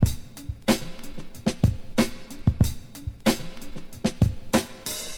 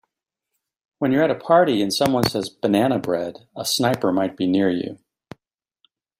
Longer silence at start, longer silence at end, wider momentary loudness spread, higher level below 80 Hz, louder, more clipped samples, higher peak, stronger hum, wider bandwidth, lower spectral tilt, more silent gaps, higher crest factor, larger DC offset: second, 0 s vs 1 s; second, 0 s vs 1.25 s; first, 16 LU vs 9 LU; first, -36 dBFS vs -58 dBFS; second, -26 LUFS vs -20 LUFS; neither; second, -6 dBFS vs 0 dBFS; neither; first, 19.5 kHz vs 16 kHz; about the same, -5.5 dB/octave vs -5 dB/octave; neither; about the same, 20 dB vs 22 dB; first, 0.5% vs under 0.1%